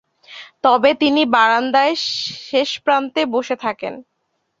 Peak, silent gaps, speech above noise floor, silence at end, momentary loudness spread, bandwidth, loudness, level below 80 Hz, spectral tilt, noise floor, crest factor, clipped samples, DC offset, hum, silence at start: -2 dBFS; none; 54 dB; 0.6 s; 12 LU; 7.8 kHz; -17 LUFS; -62 dBFS; -3 dB/octave; -71 dBFS; 16 dB; under 0.1%; under 0.1%; none; 0.3 s